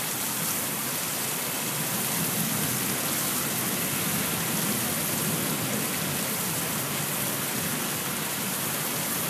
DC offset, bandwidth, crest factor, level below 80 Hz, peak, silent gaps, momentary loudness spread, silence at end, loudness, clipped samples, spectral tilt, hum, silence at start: under 0.1%; 15.5 kHz; 14 dB; -62 dBFS; -14 dBFS; none; 2 LU; 0 s; -26 LUFS; under 0.1%; -2.5 dB/octave; none; 0 s